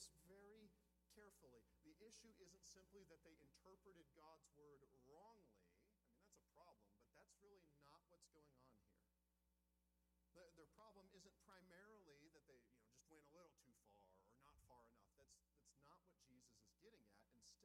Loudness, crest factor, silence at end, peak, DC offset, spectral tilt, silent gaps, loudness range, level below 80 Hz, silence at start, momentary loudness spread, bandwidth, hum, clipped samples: -68 LUFS; 24 dB; 0 s; -48 dBFS; under 0.1%; -3 dB/octave; none; 1 LU; -86 dBFS; 0 s; 3 LU; 13 kHz; none; under 0.1%